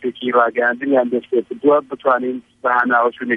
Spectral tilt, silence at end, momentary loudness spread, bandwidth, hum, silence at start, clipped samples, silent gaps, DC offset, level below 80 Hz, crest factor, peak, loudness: -7 dB/octave; 0 s; 5 LU; 4.5 kHz; none; 0 s; under 0.1%; none; under 0.1%; -68 dBFS; 16 dB; -2 dBFS; -17 LUFS